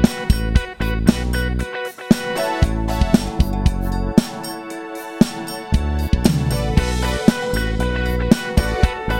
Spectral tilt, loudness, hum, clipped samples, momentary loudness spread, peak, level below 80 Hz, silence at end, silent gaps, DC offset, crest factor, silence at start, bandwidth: -6 dB/octave; -20 LUFS; none; under 0.1%; 9 LU; 0 dBFS; -22 dBFS; 0 s; none; under 0.1%; 18 dB; 0 s; 17 kHz